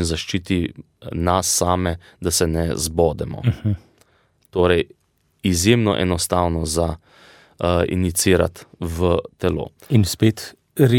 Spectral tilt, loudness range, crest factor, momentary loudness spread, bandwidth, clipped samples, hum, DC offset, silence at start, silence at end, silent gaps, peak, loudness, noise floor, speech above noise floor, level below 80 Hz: -5 dB/octave; 2 LU; 18 dB; 12 LU; 17.5 kHz; under 0.1%; none; under 0.1%; 0 s; 0 s; none; -2 dBFS; -20 LUFS; -60 dBFS; 40 dB; -38 dBFS